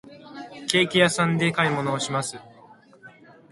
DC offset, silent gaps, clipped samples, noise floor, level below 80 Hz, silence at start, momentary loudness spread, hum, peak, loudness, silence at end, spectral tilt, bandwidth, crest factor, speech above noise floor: under 0.1%; none; under 0.1%; -51 dBFS; -62 dBFS; 0.05 s; 21 LU; none; 0 dBFS; -22 LUFS; 0.4 s; -4 dB/octave; 11.5 kHz; 24 dB; 29 dB